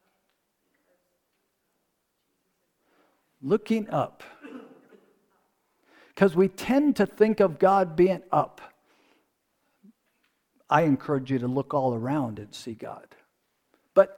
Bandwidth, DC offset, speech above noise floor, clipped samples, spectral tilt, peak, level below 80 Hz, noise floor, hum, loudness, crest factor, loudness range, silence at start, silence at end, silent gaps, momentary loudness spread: 19 kHz; under 0.1%; 52 dB; under 0.1%; -7.5 dB/octave; -4 dBFS; -64 dBFS; -76 dBFS; none; -25 LUFS; 24 dB; 9 LU; 3.45 s; 0.05 s; none; 18 LU